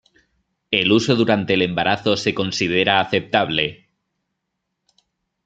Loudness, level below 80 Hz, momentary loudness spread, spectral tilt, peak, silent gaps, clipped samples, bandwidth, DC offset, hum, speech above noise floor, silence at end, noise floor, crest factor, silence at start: -18 LUFS; -58 dBFS; 5 LU; -4.5 dB/octave; -2 dBFS; none; under 0.1%; 9 kHz; under 0.1%; none; 59 dB; 1.7 s; -77 dBFS; 20 dB; 0.7 s